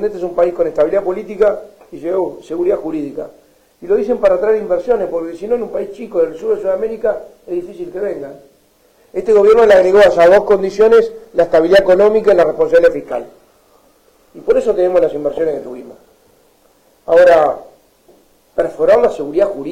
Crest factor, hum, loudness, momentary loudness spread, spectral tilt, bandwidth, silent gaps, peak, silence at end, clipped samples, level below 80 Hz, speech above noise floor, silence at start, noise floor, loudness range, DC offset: 12 dB; none; -13 LUFS; 17 LU; -5.5 dB/octave; 12.5 kHz; none; -2 dBFS; 0 s; under 0.1%; -46 dBFS; 40 dB; 0 s; -52 dBFS; 9 LU; under 0.1%